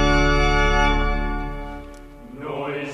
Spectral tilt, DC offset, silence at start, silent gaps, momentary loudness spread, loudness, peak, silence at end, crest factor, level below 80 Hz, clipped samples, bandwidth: -5 dB/octave; under 0.1%; 0 s; none; 21 LU; -21 LUFS; -6 dBFS; 0 s; 14 dB; -24 dBFS; under 0.1%; 9.2 kHz